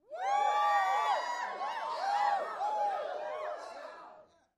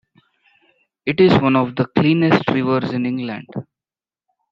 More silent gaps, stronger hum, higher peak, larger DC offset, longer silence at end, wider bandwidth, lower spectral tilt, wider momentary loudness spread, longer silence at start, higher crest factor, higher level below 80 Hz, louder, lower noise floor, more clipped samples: neither; neither; second, -18 dBFS vs 0 dBFS; neither; second, 0.35 s vs 0.9 s; first, 13.5 kHz vs 7.4 kHz; second, -0.5 dB/octave vs -8.5 dB/octave; about the same, 15 LU vs 14 LU; second, 0.1 s vs 1.05 s; about the same, 16 dB vs 18 dB; second, -84 dBFS vs -56 dBFS; second, -33 LUFS vs -17 LUFS; second, -58 dBFS vs under -90 dBFS; neither